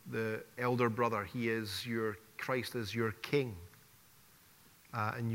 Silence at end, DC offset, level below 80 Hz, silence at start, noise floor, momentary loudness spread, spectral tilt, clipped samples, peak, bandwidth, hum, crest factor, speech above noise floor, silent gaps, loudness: 0 s; under 0.1%; -72 dBFS; 0.05 s; -63 dBFS; 10 LU; -6 dB/octave; under 0.1%; -16 dBFS; 16 kHz; none; 20 dB; 27 dB; none; -36 LUFS